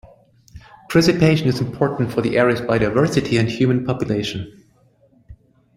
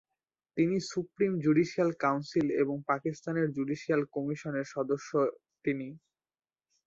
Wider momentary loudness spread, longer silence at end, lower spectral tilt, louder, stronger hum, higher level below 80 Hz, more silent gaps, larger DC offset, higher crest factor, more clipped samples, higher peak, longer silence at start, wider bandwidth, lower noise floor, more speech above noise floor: about the same, 7 LU vs 8 LU; second, 0.4 s vs 0.9 s; about the same, -6.5 dB/octave vs -7 dB/octave; first, -18 LUFS vs -31 LUFS; neither; first, -46 dBFS vs -70 dBFS; neither; neither; about the same, 18 dB vs 18 dB; neither; first, -2 dBFS vs -14 dBFS; about the same, 0.55 s vs 0.55 s; first, 15.5 kHz vs 7.8 kHz; second, -56 dBFS vs -90 dBFS; second, 38 dB vs 59 dB